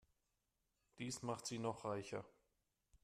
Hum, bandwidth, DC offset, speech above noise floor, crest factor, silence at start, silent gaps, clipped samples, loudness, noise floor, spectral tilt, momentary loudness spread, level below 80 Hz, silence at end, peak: none; 14 kHz; under 0.1%; 41 dB; 22 dB; 0.95 s; none; under 0.1%; -47 LUFS; -87 dBFS; -4.5 dB/octave; 7 LU; -80 dBFS; 0.75 s; -28 dBFS